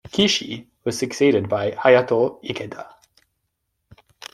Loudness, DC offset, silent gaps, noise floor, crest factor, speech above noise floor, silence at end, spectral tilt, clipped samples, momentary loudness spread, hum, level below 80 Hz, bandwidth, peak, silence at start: -20 LUFS; under 0.1%; none; -75 dBFS; 20 dB; 55 dB; 1.45 s; -4 dB/octave; under 0.1%; 17 LU; none; -60 dBFS; 13 kHz; -2 dBFS; 0.15 s